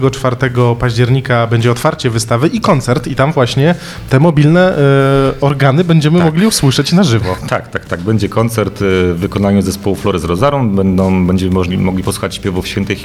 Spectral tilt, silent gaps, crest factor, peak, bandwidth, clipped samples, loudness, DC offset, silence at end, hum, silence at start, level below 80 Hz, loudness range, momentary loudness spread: -6 dB/octave; none; 12 dB; 0 dBFS; 15 kHz; 0.2%; -12 LUFS; under 0.1%; 0 s; none; 0 s; -34 dBFS; 4 LU; 8 LU